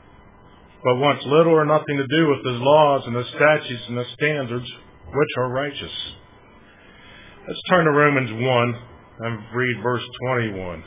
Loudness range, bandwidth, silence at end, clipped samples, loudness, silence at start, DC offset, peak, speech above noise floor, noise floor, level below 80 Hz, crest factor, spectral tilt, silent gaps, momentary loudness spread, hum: 8 LU; 3.9 kHz; 0 s; under 0.1%; -20 LUFS; 0.85 s; under 0.1%; -2 dBFS; 28 dB; -48 dBFS; -54 dBFS; 20 dB; -10 dB/octave; none; 14 LU; none